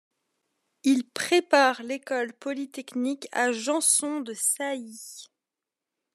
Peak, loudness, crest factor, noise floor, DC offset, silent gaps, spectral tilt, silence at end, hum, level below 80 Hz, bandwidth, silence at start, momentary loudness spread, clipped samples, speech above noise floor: -6 dBFS; -25 LUFS; 22 dB; -88 dBFS; under 0.1%; none; -1 dB/octave; 0.9 s; none; -88 dBFS; 14 kHz; 0.85 s; 14 LU; under 0.1%; 62 dB